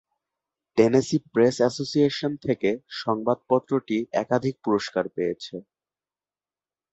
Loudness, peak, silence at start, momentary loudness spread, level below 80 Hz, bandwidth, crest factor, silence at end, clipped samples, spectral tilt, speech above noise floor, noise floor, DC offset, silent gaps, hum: -24 LUFS; -4 dBFS; 0.75 s; 9 LU; -62 dBFS; 8.2 kHz; 20 dB; 1.3 s; under 0.1%; -6 dB/octave; over 66 dB; under -90 dBFS; under 0.1%; none; none